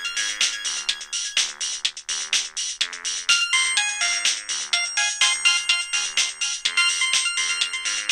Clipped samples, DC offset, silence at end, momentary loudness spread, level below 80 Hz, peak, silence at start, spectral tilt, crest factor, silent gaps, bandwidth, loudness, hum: under 0.1%; under 0.1%; 0 s; 7 LU; -64 dBFS; -4 dBFS; 0 s; 5 dB/octave; 20 dB; none; 15.5 kHz; -21 LUFS; none